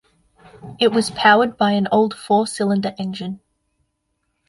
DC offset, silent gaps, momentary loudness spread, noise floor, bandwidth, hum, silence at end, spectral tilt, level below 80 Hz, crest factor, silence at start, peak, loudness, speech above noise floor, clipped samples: under 0.1%; none; 14 LU; -72 dBFS; 11.5 kHz; none; 1.1 s; -5 dB/octave; -60 dBFS; 18 dB; 0.65 s; -2 dBFS; -18 LUFS; 54 dB; under 0.1%